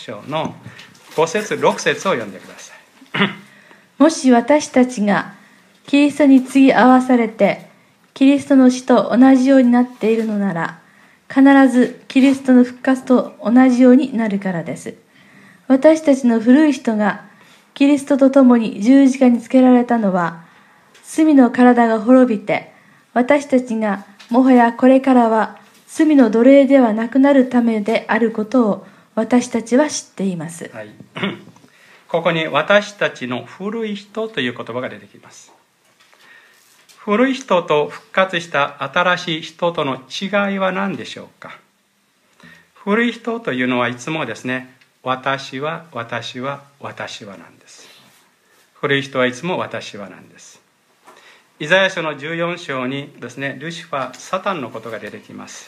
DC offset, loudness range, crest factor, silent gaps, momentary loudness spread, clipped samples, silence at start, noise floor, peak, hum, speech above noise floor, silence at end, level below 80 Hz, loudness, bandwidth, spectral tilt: under 0.1%; 10 LU; 16 dB; none; 17 LU; under 0.1%; 0 s; -61 dBFS; 0 dBFS; none; 46 dB; 0.05 s; -70 dBFS; -16 LUFS; 11 kHz; -5.5 dB/octave